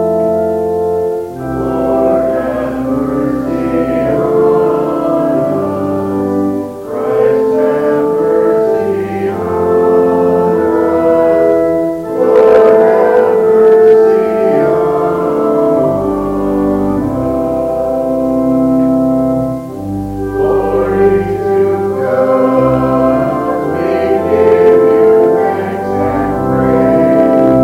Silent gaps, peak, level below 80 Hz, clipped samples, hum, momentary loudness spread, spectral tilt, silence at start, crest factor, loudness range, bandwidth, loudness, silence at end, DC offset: none; 0 dBFS; -36 dBFS; 0.1%; none; 8 LU; -8.5 dB/octave; 0 s; 10 dB; 5 LU; 15.5 kHz; -11 LUFS; 0 s; under 0.1%